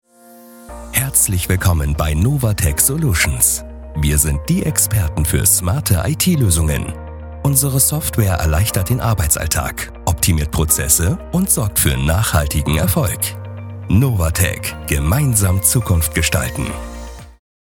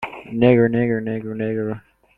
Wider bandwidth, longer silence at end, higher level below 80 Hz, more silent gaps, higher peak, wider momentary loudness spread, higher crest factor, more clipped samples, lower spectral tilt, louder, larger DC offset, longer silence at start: first, 18.5 kHz vs 4.2 kHz; about the same, 0.5 s vs 0.4 s; first, -28 dBFS vs -50 dBFS; neither; about the same, 0 dBFS vs -2 dBFS; second, 10 LU vs 14 LU; about the same, 16 dB vs 18 dB; neither; second, -4 dB/octave vs -10 dB/octave; first, -16 LUFS vs -20 LUFS; neither; first, 0.3 s vs 0 s